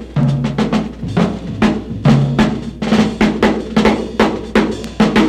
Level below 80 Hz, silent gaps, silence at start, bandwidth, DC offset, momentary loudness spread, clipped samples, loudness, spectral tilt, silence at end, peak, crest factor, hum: -32 dBFS; none; 0 s; 11 kHz; under 0.1%; 5 LU; under 0.1%; -15 LUFS; -7 dB/octave; 0 s; 0 dBFS; 14 dB; none